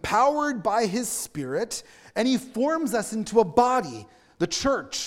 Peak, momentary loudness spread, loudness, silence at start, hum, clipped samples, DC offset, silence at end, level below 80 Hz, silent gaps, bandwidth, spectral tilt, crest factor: -6 dBFS; 10 LU; -25 LUFS; 0.05 s; none; under 0.1%; under 0.1%; 0 s; -54 dBFS; none; 17 kHz; -3.5 dB/octave; 20 dB